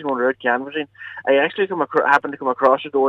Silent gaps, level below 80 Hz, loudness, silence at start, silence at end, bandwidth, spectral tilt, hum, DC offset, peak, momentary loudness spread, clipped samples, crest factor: none; -70 dBFS; -19 LUFS; 0 s; 0 s; 7.8 kHz; -5.5 dB/octave; none; under 0.1%; -2 dBFS; 11 LU; under 0.1%; 16 dB